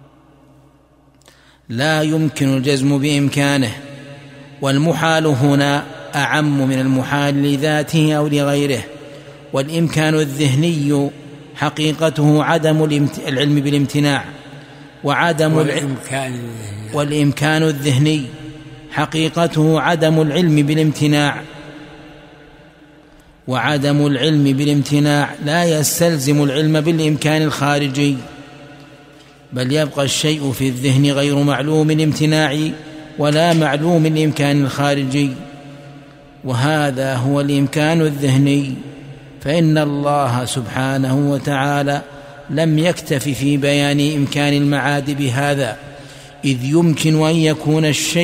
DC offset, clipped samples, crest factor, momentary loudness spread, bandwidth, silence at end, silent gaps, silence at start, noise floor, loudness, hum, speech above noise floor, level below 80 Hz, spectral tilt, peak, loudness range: under 0.1%; under 0.1%; 16 dB; 15 LU; 16 kHz; 0 s; none; 1.7 s; -51 dBFS; -16 LUFS; none; 35 dB; -52 dBFS; -5.5 dB/octave; 0 dBFS; 3 LU